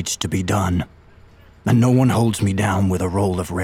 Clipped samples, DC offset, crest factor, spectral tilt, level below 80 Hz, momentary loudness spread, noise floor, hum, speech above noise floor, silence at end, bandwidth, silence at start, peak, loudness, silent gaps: under 0.1%; under 0.1%; 14 dB; -6 dB/octave; -42 dBFS; 7 LU; -47 dBFS; none; 29 dB; 0 s; 16 kHz; 0 s; -4 dBFS; -19 LUFS; none